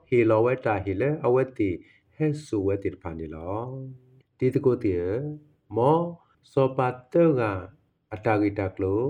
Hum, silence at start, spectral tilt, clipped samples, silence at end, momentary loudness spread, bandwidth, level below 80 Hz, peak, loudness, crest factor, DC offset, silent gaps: none; 0.1 s; -9 dB/octave; under 0.1%; 0 s; 14 LU; 10.5 kHz; -60 dBFS; -8 dBFS; -26 LUFS; 18 dB; under 0.1%; none